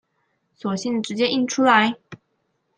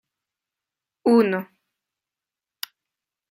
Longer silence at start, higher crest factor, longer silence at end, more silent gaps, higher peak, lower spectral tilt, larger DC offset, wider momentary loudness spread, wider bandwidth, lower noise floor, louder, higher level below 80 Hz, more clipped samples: second, 0.65 s vs 1.05 s; about the same, 20 dB vs 20 dB; second, 0.65 s vs 1.85 s; neither; first, -2 dBFS vs -6 dBFS; second, -4 dB/octave vs -6 dB/octave; neither; second, 13 LU vs 18 LU; second, 9.8 kHz vs 16 kHz; second, -71 dBFS vs -89 dBFS; about the same, -20 LUFS vs -21 LUFS; first, -72 dBFS vs -78 dBFS; neither